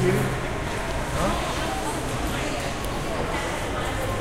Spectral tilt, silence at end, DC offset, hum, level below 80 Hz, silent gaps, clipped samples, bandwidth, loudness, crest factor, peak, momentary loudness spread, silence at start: -4.5 dB/octave; 0 s; under 0.1%; none; -34 dBFS; none; under 0.1%; 16 kHz; -27 LUFS; 16 dB; -10 dBFS; 3 LU; 0 s